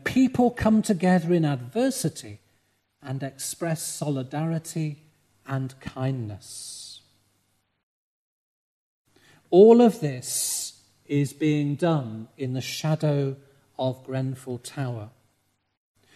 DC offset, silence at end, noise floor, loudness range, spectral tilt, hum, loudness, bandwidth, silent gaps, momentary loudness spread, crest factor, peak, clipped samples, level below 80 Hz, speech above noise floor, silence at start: under 0.1%; 1.05 s; -71 dBFS; 14 LU; -6 dB/octave; none; -24 LUFS; 13.5 kHz; 7.83-9.05 s; 16 LU; 22 dB; -4 dBFS; under 0.1%; -58 dBFS; 47 dB; 0.05 s